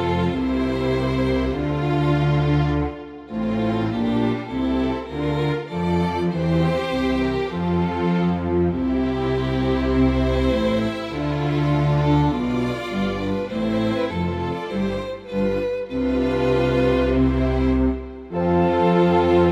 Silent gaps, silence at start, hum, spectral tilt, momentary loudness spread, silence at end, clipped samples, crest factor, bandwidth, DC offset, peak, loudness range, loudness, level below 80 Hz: none; 0 s; none; -8 dB/octave; 6 LU; 0 s; under 0.1%; 14 dB; 10 kHz; under 0.1%; -6 dBFS; 3 LU; -21 LUFS; -32 dBFS